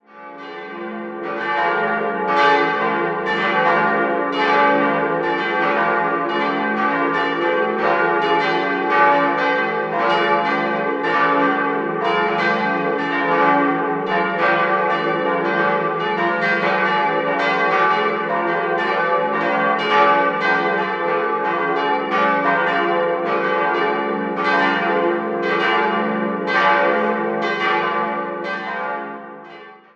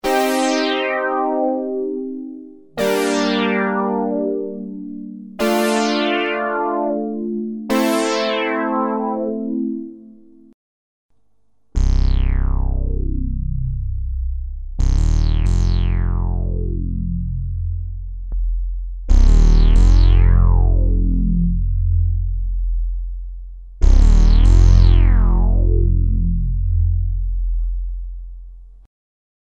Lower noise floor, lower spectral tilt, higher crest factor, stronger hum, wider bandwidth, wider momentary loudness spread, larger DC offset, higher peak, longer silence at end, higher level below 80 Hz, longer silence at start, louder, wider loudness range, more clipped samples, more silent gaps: second, -40 dBFS vs -68 dBFS; about the same, -6 dB/octave vs -6.5 dB/octave; about the same, 18 dB vs 14 dB; neither; second, 8 kHz vs 12.5 kHz; second, 6 LU vs 15 LU; second, under 0.1% vs 0.2%; about the same, -2 dBFS vs -2 dBFS; second, 0.2 s vs 0.8 s; second, -64 dBFS vs -18 dBFS; about the same, 0.15 s vs 0.05 s; about the same, -18 LUFS vs -19 LUFS; second, 1 LU vs 8 LU; neither; second, none vs 10.54-11.09 s